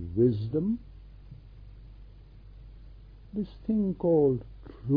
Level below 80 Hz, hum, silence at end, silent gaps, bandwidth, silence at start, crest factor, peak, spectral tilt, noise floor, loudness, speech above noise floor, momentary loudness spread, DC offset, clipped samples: -48 dBFS; none; 0 s; none; 5 kHz; 0 s; 18 dB; -12 dBFS; -13 dB/octave; -49 dBFS; -28 LUFS; 23 dB; 27 LU; under 0.1%; under 0.1%